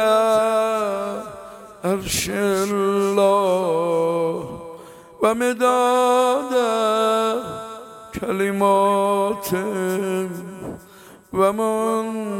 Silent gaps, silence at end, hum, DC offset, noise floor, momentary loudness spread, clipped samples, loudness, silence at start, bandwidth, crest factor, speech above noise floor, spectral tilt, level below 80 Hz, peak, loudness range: none; 0 s; none; under 0.1%; -45 dBFS; 17 LU; under 0.1%; -20 LUFS; 0 s; 17 kHz; 18 dB; 26 dB; -4.5 dB/octave; -52 dBFS; -4 dBFS; 2 LU